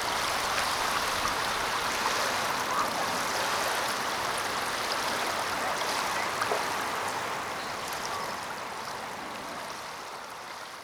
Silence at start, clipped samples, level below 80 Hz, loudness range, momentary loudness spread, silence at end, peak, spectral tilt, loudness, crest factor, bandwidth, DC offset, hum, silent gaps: 0 s; under 0.1%; -58 dBFS; 6 LU; 9 LU; 0 s; -12 dBFS; -1.5 dB/octave; -30 LUFS; 20 dB; over 20 kHz; under 0.1%; none; none